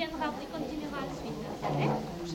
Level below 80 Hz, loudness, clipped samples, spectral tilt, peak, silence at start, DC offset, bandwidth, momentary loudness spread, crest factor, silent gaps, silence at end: -54 dBFS; -35 LUFS; under 0.1%; -6 dB/octave; -18 dBFS; 0 s; under 0.1%; 17 kHz; 7 LU; 16 dB; none; 0 s